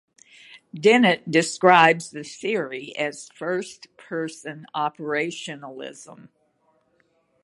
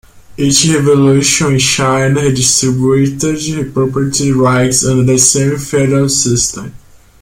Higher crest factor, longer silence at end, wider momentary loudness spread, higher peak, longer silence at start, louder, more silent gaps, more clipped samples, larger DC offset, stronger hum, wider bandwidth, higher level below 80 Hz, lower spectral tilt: first, 24 dB vs 12 dB; first, 1.3 s vs 0.45 s; first, 21 LU vs 7 LU; about the same, 0 dBFS vs 0 dBFS; first, 0.75 s vs 0.3 s; second, -22 LUFS vs -11 LUFS; neither; neither; neither; neither; second, 11.5 kHz vs 16.5 kHz; second, -72 dBFS vs -38 dBFS; about the same, -4 dB/octave vs -4 dB/octave